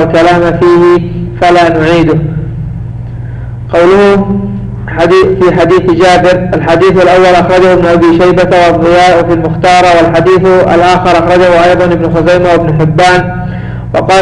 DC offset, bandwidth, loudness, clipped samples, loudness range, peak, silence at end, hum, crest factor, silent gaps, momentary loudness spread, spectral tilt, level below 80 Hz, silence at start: under 0.1%; 10.5 kHz; -6 LUFS; under 0.1%; 4 LU; 0 dBFS; 0 s; none; 6 dB; none; 12 LU; -6.5 dB/octave; -28 dBFS; 0 s